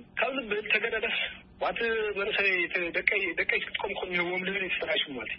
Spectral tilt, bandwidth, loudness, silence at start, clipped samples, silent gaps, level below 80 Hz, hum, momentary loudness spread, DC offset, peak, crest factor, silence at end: -7.5 dB/octave; 5.8 kHz; -28 LUFS; 0 s; under 0.1%; none; -60 dBFS; none; 7 LU; under 0.1%; -8 dBFS; 22 dB; 0 s